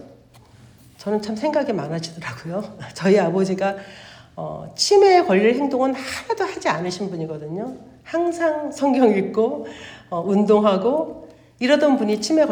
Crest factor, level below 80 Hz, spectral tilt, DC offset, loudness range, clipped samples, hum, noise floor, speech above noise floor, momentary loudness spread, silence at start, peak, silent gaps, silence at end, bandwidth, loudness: 18 dB; -60 dBFS; -5 dB/octave; under 0.1%; 5 LU; under 0.1%; none; -49 dBFS; 29 dB; 16 LU; 0 s; -2 dBFS; none; 0 s; 15.5 kHz; -20 LUFS